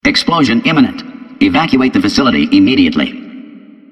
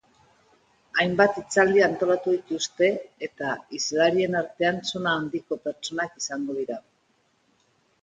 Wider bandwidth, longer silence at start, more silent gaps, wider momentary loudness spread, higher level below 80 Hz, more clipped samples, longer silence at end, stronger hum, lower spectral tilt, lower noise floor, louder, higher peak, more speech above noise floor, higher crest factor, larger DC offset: first, 10.5 kHz vs 9.4 kHz; second, 0.05 s vs 0.95 s; neither; first, 16 LU vs 11 LU; first, -40 dBFS vs -66 dBFS; neither; second, 0.35 s vs 1.2 s; neither; about the same, -5 dB/octave vs -4 dB/octave; second, -35 dBFS vs -67 dBFS; first, -11 LUFS vs -25 LUFS; first, 0 dBFS vs -6 dBFS; second, 25 dB vs 43 dB; second, 12 dB vs 20 dB; neither